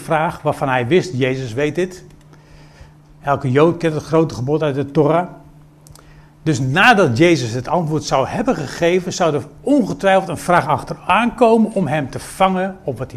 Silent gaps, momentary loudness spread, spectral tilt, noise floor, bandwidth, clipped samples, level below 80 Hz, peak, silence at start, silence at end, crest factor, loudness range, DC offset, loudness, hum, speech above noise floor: none; 8 LU; -6 dB/octave; -43 dBFS; 14.5 kHz; under 0.1%; -46 dBFS; 0 dBFS; 0 s; 0 s; 18 dB; 4 LU; under 0.1%; -17 LUFS; none; 27 dB